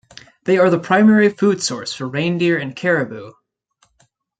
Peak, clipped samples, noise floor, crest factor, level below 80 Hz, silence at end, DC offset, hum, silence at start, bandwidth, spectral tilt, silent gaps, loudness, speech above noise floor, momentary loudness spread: -2 dBFS; under 0.1%; -63 dBFS; 16 dB; -62 dBFS; 1.1 s; under 0.1%; none; 0.45 s; 9.2 kHz; -5.5 dB/octave; none; -17 LUFS; 46 dB; 13 LU